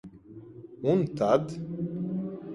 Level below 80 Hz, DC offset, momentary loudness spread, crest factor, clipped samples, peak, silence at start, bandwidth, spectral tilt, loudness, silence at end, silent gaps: -64 dBFS; under 0.1%; 22 LU; 20 dB; under 0.1%; -10 dBFS; 0.05 s; 11.5 kHz; -8.5 dB/octave; -29 LUFS; 0 s; none